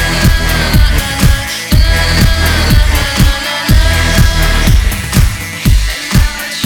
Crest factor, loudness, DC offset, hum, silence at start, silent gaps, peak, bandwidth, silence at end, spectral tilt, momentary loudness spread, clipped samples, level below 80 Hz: 10 dB; -11 LUFS; under 0.1%; none; 0 s; none; 0 dBFS; over 20 kHz; 0 s; -4 dB/octave; 3 LU; 0.9%; -12 dBFS